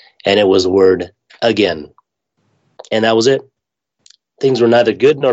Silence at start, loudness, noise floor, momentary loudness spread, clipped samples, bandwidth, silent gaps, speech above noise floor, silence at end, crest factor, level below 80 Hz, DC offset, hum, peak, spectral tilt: 0.25 s; -13 LUFS; -74 dBFS; 8 LU; under 0.1%; 8.2 kHz; none; 62 dB; 0 s; 14 dB; -56 dBFS; under 0.1%; none; 0 dBFS; -5 dB/octave